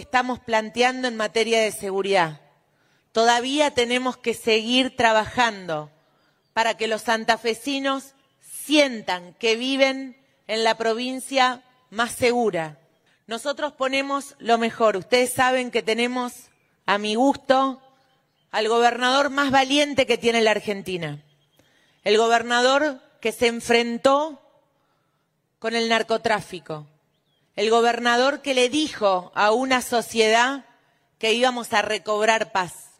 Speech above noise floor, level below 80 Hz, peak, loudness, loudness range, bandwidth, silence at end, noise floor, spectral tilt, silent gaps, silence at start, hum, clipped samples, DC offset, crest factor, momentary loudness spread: 50 dB; -62 dBFS; -2 dBFS; -22 LUFS; 4 LU; 16 kHz; 0.15 s; -71 dBFS; -3 dB/octave; none; 0 s; none; under 0.1%; under 0.1%; 22 dB; 11 LU